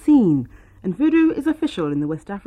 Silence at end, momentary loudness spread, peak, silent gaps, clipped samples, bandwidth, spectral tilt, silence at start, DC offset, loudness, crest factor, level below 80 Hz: 0.1 s; 13 LU; -6 dBFS; none; under 0.1%; 9.4 kHz; -8 dB/octave; 0.05 s; under 0.1%; -20 LUFS; 12 dB; -50 dBFS